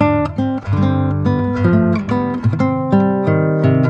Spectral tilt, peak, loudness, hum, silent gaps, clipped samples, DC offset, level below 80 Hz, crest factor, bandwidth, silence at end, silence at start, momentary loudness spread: -10 dB/octave; 0 dBFS; -16 LUFS; none; none; under 0.1%; under 0.1%; -40 dBFS; 14 dB; 7 kHz; 0 s; 0 s; 4 LU